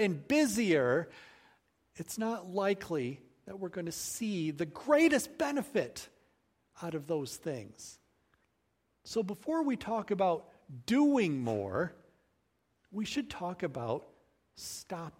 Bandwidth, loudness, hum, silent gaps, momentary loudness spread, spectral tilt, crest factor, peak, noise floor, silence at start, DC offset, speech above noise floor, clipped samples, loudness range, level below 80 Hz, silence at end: 16 kHz; -33 LUFS; none; none; 17 LU; -5 dB/octave; 20 dB; -14 dBFS; -78 dBFS; 0 s; under 0.1%; 45 dB; under 0.1%; 8 LU; -70 dBFS; 0.1 s